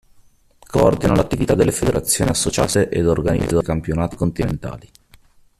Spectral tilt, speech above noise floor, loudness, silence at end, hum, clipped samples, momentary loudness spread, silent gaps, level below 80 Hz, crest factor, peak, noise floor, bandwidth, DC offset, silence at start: -5 dB/octave; 34 dB; -18 LUFS; 0.8 s; none; under 0.1%; 7 LU; none; -34 dBFS; 18 dB; -2 dBFS; -52 dBFS; 14.5 kHz; under 0.1%; 0.7 s